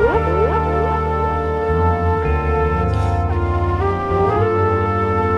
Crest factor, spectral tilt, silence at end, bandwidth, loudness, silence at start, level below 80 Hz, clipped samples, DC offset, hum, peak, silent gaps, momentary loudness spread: 14 dB; -9 dB/octave; 0 s; 7 kHz; -18 LUFS; 0 s; -26 dBFS; under 0.1%; under 0.1%; none; -4 dBFS; none; 3 LU